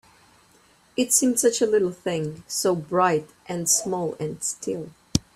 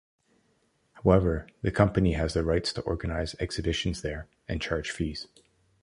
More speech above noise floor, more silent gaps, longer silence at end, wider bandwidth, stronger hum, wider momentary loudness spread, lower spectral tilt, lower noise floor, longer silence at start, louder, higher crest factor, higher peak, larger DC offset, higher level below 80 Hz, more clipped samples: second, 34 dB vs 42 dB; neither; second, 0.15 s vs 0.55 s; first, 15.5 kHz vs 11 kHz; neither; about the same, 11 LU vs 12 LU; second, -3.5 dB/octave vs -6 dB/octave; second, -58 dBFS vs -70 dBFS; about the same, 0.95 s vs 0.95 s; first, -23 LUFS vs -28 LUFS; about the same, 24 dB vs 24 dB; first, 0 dBFS vs -6 dBFS; neither; second, -54 dBFS vs -40 dBFS; neither